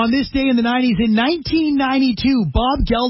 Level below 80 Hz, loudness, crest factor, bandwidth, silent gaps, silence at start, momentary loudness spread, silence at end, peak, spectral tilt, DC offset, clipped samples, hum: -30 dBFS; -17 LUFS; 12 dB; 5.8 kHz; none; 0 s; 2 LU; 0 s; -4 dBFS; -9.5 dB/octave; under 0.1%; under 0.1%; none